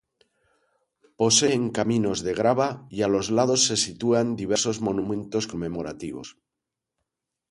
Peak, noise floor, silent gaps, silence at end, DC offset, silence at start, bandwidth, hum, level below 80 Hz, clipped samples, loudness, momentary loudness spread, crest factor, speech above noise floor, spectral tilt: -6 dBFS; -86 dBFS; none; 1.2 s; under 0.1%; 1.2 s; 11.5 kHz; none; -56 dBFS; under 0.1%; -24 LUFS; 13 LU; 20 dB; 62 dB; -3.5 dB/octave